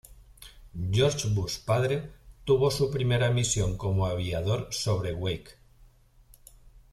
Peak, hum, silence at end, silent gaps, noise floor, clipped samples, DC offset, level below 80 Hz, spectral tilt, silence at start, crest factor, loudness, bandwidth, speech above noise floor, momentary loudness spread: -12 dBFS; none; 0.15 s; none; -57 dBFS; under 0.1%; under 0.1%; -46 dBFS; -5 dB/octave; 0.1 s; 18 dB; -28 LUFS; 14 kHz; 30 dB; 9 LU